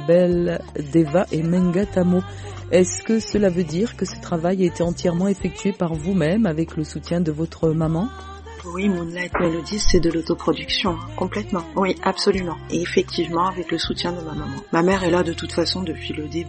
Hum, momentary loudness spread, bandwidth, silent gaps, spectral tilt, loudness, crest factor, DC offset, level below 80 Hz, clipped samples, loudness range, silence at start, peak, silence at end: none; 8 LU; 8.8 kHz; none; -5.5 dB/octave; -22 LUFS; 18 dB; under 0.1%; -36 dBFS; under 0.1%; 3 LU; 0 s; -2 dBFS; 0 s